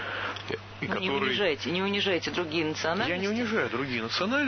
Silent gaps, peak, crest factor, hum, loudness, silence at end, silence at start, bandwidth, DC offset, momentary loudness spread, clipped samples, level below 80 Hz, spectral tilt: none; -12 dBFS; 16 dB; none; -28 LUFS; 0 s; 0 s; 6.6 kHz; under 0.1%; 7 LU; under 0.1%; -58 dBFS; -4.5 dB/octave